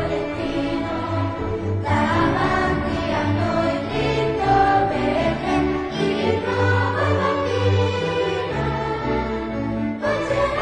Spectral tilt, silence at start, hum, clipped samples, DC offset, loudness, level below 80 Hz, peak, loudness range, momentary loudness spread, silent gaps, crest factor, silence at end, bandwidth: -7 dB/octave; 0 s; none; under 0.1%; under 0.1%; -21 LUFS; -38 dBFS; -6 dBFS; 2 LU; 6 LU; none; 14 dB; 0 s; 10 kHz